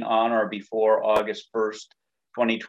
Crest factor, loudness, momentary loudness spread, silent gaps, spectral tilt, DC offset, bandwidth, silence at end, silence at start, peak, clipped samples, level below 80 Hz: 16 dB; -24 LUFS; 8 LU; none; -5 dB/octave; under 0.1%; 13 kHz; 0 s; 0 s; -8 dBFS; under 0.1%; -66 dBFS